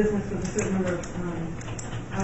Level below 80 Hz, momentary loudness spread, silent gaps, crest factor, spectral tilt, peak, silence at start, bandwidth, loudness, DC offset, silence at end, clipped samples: -40 dBFS; 8 LU; none; 18 dB; -6 dB/octave; -10 dBFS; 0 s; 8.2 kHz; -30 LUFS; under 0.1%; 0 s; under 0.1%